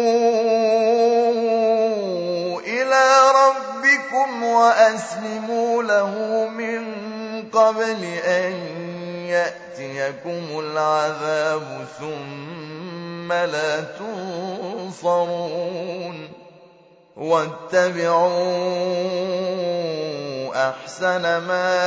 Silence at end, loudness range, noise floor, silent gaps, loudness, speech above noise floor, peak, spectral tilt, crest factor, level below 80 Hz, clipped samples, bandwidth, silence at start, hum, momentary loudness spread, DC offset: 0 s; 9 LU; -51 dBFS; none; -20 LUFS; 30 dB; -4 dBFS; -4 dB/octave; 18 dB; -76 dBFS; under 0.1%; 8 kHz; 0 s; none; 14 LU; under 0.1%